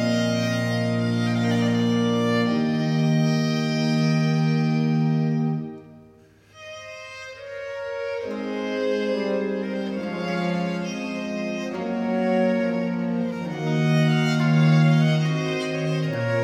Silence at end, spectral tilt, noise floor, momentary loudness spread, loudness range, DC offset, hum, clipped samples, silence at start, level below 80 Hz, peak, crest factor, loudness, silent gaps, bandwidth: 0 s; -7 dB/octave; -52 dBFS; 11 LU; 8 LU; under 0.1%; none; under 0.1%; 0 s; -64 dBFS; -8 dBFS; 14 dB; -23 LUFS; none; 9.8 kHz